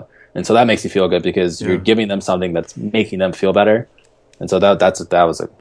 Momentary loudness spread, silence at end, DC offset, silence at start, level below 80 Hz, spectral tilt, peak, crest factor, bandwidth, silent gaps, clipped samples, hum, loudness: 8 LU; 0.15 s; under 0.1%; 0 s; -50 dBFS; -5.5 dB/octave; 0 dBFS; 16 dB; 11 kHz; none; under 0.1%; none; -16 LUFS